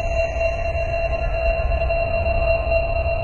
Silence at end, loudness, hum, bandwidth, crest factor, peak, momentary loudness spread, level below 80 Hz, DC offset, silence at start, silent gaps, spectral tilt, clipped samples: 0 s; -22 LUFS; none; 7.2 kHz; 14 dB; -6 dBFS; 3 LU; -24 dBFS; 1%; 0 s; none; -6.5 dB/octave; under 0.1%